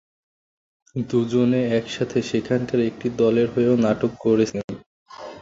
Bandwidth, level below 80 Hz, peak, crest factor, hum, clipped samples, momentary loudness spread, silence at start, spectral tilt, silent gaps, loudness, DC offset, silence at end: 7.8 kHz; -56 dBFS; -6 dBFS; 16 dB; none; under 0.1%; 14 LU; 0.95 s; -7 dB/octave; 4.64-4.68 s, 4.86-5.06 s; -21 LUFS; under 0.1%; 0 s